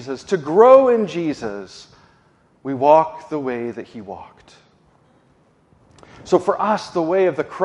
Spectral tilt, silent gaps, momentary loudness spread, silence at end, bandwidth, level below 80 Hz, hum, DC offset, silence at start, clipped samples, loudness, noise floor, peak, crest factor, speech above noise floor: -6.5 dB/octave; none; 23 LU; 0 s; 9.6 kHz; -60 dBFS; none; under 0.1%; 0 s; under 0.1%; -17 LUFS; -57 dBFS; 0 dBFS; 20 dB; 39 dB